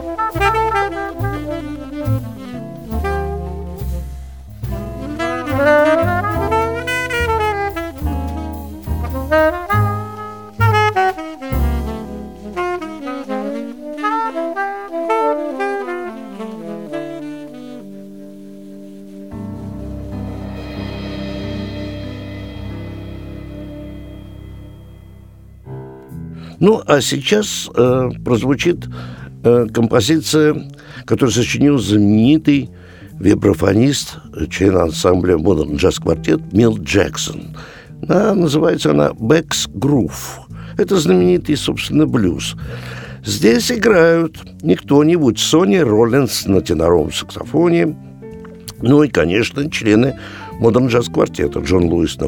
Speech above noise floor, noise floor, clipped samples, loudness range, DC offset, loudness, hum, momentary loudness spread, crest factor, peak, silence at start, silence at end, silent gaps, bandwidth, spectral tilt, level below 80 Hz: 26 dB; -40 dBFS; under 0.1%; 14 LU; 0.3%; -16 LUFS; none; 19 LU; 16 dB; 0 dBFS; 0 s; 0 s; none; over 20 kHz; -5.5 dB/octave; -34 dBFS